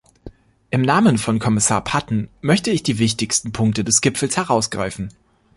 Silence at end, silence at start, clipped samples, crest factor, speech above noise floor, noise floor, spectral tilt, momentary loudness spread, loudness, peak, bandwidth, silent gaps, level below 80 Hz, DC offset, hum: 0.45 s; 0.25 s; under 0.1%; 16 dB; 23 dB; -42 dBFS; -4 dB/octave; 9 LU; -18 LUFS; -2 dBFS; 11.5 kHz; none; -46 dBFS; under 0.1%; none